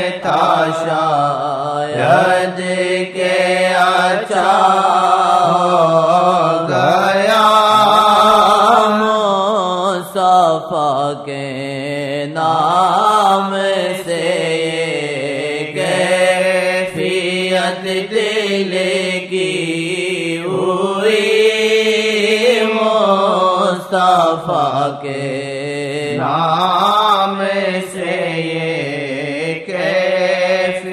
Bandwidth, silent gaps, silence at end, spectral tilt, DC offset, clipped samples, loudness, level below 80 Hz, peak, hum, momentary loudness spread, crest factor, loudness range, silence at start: 15.5 kHz; none; 0 s; -4.5 dB/octave; under 0.1%; under 0.1%; -14 LUFS; -60 dBFS; 0 dBFS; none; 9 LU; 14 dB; 5 LU; 0 s